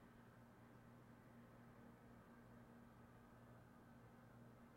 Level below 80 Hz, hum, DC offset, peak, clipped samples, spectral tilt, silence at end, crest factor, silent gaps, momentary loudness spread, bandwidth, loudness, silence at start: -78 dBFS; none; under 0.1%; -52 dBFS; under 0.1%; -7 dB/octave; 0 s; 12 dB; none; 1 LU; 16 kHz; -66 LUFS; 0 s